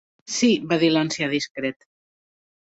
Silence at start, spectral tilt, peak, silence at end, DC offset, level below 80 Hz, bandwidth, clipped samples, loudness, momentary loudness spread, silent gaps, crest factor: 0.3 s; -4 dB/octave; -6 dBFS; 0.95 s; under 0.1%; -66 dBFS; 8.2 kHz; under 0.1%; -22 LUFS; 10 LU; 1.50-1.55 s; 18 dB